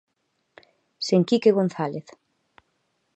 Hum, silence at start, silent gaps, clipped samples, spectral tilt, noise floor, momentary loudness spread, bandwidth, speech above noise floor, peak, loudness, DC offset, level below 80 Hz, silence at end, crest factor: none; 1 s; none; under 0.1%; -6.5 dB/octave; -74 dBFS; 13 LU; 8.6 kHz; 53 dB; -6 dBFS; -22 LUFS; under 0.1%; -76 dBFS; 1.15 s; 20 dB